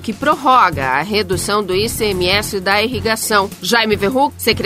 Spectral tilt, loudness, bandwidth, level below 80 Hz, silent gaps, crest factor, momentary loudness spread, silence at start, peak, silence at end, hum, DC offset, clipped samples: -3.5 dB/octave; -15 LUFS; 16 kHz; -38 dBFS; none; 16 dB; 5 LU; 0 s; 0 dBFS; 0 s; none; under 0.1%; under 0.1%